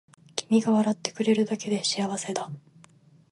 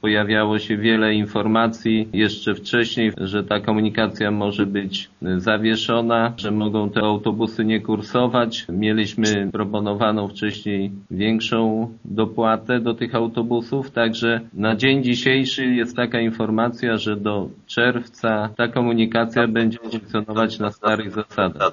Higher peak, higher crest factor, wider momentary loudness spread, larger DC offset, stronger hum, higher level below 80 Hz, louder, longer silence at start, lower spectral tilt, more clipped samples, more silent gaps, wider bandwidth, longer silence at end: second, -6 dBFS vs -2 dBFS; about the same, 20 dB vs 18 dB; first, 12 LU vs 6 LU; neither; neither; second, -74 dBFS vs -56 dBFS; second, -26 LUFS vs -21 LUFS; first, 0.35 s vs 0.05 s; about the same, -4.5 dB/octave vs -4 dB/octave; neither; neither; first, 11.5 kHz vs 7.2 kHz; first, 0.7 s vs 0 s